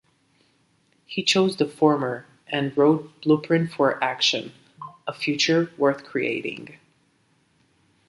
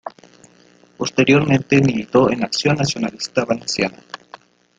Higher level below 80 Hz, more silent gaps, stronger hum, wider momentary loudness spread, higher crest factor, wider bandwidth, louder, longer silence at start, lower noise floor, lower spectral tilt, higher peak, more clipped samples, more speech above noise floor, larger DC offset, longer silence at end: second, -72 dBFS vs -52 dBFS; neither; neither; about the same, 15 LU vs 17 LU; about the same, 20 dB vs 18 dB; first, 11.5 kHz vs 9.4 kHz; second, -23 LUFS vs -18 LUFS; first, 1.1 s vs 0.05 s; first, -65 dBFS vs -51 dBFS; about the same, -4.5 dB/octave vs -5 dB/octave; second, -6 dBFS vs -2 dBFS; neither; first, 42 dB vs 34 dB; neither; first, 1.35 s vs 0.65 s